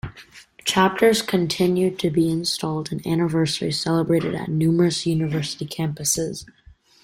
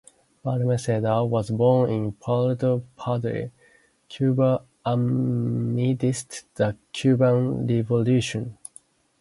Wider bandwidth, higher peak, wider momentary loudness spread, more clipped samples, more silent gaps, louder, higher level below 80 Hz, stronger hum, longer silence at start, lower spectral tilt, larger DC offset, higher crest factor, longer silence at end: first, 16.5 kHz vs 11.5 kHz; about the same, -4 dBFS vs -6 dBFS; second, 9 LU vs 12 LU; neither; neither; first, -21 LUFS vs -24 LUFS; about the same, -52 dBFS vs -56 dBFS; neither; second, 0.05 s vs 0.45 s; second, -5 dB/octave vs -7.5 dB/octave; neither; about the same, 18 dB vs 16 dB; about the same, 0.6 s vs 0.65 s